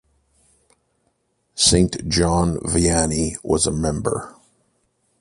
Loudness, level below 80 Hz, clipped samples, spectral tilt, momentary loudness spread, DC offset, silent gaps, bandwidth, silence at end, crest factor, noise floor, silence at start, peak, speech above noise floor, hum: -19 LUFS; -34 dBFS; under 0.1%; -4 dB/octave; 10 LU; under 0.1%; none; 11.5 kHz; 0.9 s; 20 dB; -68 dBFS; 1.55 s; -2 dBFS; 49 dB; none